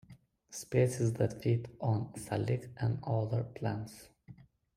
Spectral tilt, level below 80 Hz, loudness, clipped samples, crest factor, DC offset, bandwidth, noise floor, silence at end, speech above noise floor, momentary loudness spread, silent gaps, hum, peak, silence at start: -7 dB/octave; -64 dBFS; -34 LUFS; under 0.1%; 18 dB; under 0.1%; 14.5 kHz; -59 dBFS; 0.45 s; 26 dB; 12 LU; none; none; -16 dBFS; 0.1 s